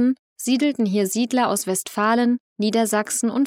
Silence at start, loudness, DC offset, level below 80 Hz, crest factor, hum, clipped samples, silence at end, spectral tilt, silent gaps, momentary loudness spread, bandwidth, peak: 0 s; -21 LUFS; under 0.1%; -76 dBFS; 14 dB; none; under 0.1%; 0 s; -4 dB/octave; 0.19-0.36 s, 2.40-2.56 s; 4 LU; 16.5 kHz; -8 dBFS